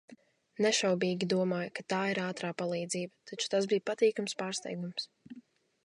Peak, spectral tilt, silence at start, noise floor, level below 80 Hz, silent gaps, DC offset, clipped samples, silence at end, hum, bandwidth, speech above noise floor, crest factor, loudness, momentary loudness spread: -16 dBFS; -4 dB/octave; 0.1 s; -58 dBFS; -82 dBFS; none; under 0.1%; under 0.1%; 0.45 s; none; 11.5 kHz; 26 dB; 18 dB; -32 LUFS; 12 LU